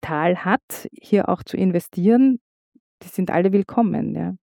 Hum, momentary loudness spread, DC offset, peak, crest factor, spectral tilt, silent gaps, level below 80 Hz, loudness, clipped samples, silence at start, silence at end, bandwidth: none; 11 LU; under 0.1%; -4 dBFS; 16 dB; -7.5 dB/octave; 0.63-0.68 s, 2.41-2.72 s, 2.80-2.98 s; -58 dBFS; -20 LUFS; under 0.1%; 0.05 s; 0.2 s; 18.5 kHz